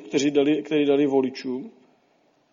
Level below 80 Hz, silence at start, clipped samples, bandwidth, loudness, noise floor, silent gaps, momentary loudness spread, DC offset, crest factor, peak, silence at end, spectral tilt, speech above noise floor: -70 dBFS; 0 s; under 0.1%; 7.6 kHz; -22 LUFS; -64 dBFS; none; 13 LU; under 0.1%; 16 dB; -8 dBFS; 0.8 s; -5 dB/octave; 42 dB